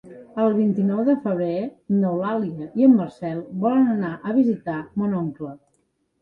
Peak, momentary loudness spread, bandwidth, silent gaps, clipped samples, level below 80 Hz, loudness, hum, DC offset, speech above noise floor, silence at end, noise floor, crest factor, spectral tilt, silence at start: -6 dBFS; 11 LU; 4.6 kHz; none; under 0.1%; -64 dBFS; -22 LUFS; none; under 0.1%; 48 dB; 0.65 s; -69 dBFS; 16 dB; -10.5 dB/octave; 0.05 s